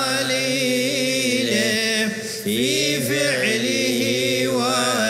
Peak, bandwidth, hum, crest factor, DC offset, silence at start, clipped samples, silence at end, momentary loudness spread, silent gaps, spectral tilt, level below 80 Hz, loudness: -6 dBFS; 16 kHz; none; 14 dB; under 0.1%; 0 s; under 0.1%; 0 s; 2 LU; none; -2.5 dB/octave; -60 dBFS; -19 LUFS